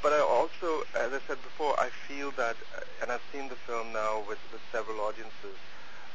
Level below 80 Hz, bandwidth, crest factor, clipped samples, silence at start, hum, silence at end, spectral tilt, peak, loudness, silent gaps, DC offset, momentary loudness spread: -68 dBFS; 8 kHz; 20 dB; under 0.1%; 0 s; none; 0 s; -3.5 dB/octave; -12 dBFS; -33 LUFS; none; 2%; 16 LU